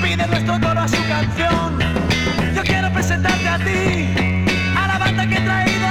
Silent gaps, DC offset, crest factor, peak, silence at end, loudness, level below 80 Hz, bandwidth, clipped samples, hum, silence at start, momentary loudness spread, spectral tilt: none; under 0.1%; 14 dB; -4 dBFS; 0 s; -17 LUFS; -32 dBFS; 15.5 kHz; under 0.1%; none; 0 s; 2 LU; -5 dB/octave